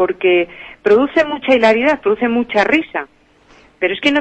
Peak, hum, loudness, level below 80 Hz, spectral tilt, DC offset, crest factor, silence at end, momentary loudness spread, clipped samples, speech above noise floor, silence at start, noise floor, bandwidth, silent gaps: -2 dBFS; none; -15 LUFS; -52 dBFS; -5 dB/octave; under 0.1%; 14 dB; 0 s; 11 LU; under 0.1%; 34 dB; 0 s; -48 dBFS; 8.6 kHz; none